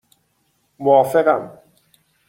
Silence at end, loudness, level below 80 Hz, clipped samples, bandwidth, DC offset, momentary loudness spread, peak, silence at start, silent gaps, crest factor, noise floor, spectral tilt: 0.8 s; -17 LUFS; -64 dBFS; under 0.1%; 16.5 kHz; under 0.1%; 11 LU; -2 dBFS; 0.8 s; none; 18 dB; -66 dBFS; -6.5 dB/octave